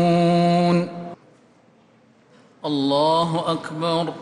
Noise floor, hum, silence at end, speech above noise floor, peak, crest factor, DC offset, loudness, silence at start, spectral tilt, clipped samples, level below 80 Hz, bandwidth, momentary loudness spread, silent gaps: -55 dBFS; none; 0 s; 34 dB; -8 dBFS; 12 dB; under 0.1%; -20 LUFS; 0 s; -7 dB/octave; under 0.1%; -64 dBFS; 10.5 kHz; 14 LU; none